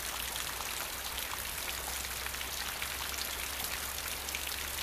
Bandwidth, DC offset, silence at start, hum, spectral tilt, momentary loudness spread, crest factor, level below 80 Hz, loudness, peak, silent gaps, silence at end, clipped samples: 15.5 kHz; under 0.1%; 0 s; none; -0.5 dB/octave; 1 LU; 18 dB; -50 dBFS; -36 LUFS; -20 dBFS; none; 0 s; under 0.1%